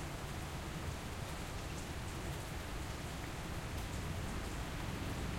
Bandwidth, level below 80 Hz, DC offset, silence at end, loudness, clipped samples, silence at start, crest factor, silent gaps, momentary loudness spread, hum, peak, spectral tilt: 16.5 kHz; -48 dBFS; under 0.1%; 0 s; -43 LUFS; under 0.1%; 0 s; 14 dB; none; 2 LU; none; -28 dBFS; -4.5 dB/octave